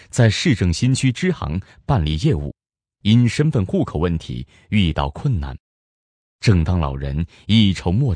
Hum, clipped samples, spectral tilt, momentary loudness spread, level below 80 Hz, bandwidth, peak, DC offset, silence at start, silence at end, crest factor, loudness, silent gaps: none; under 0.1%; -6 dB/octave; 10 LU; -32 dBFS; 10.5 kHz; -2 dBFS; under 0.1%; 0.15 s; 0 s; 16 dB; -19 LUFS; 5.60-6.39 s